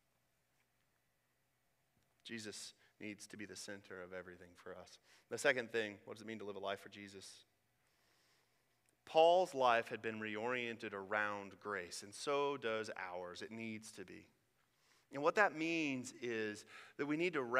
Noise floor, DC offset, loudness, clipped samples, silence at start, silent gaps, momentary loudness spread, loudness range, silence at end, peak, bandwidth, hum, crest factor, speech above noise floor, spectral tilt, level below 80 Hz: -82 dBFS; under 0.1%; -40 LUFS; under 0.1%; 2.25 s; none; 21 LU; 15 LU; 0 s; -16 dBFS; 15.5 kHz; none; 26 dB; 41 dB; -3.5 dB/octave; -88 dBFS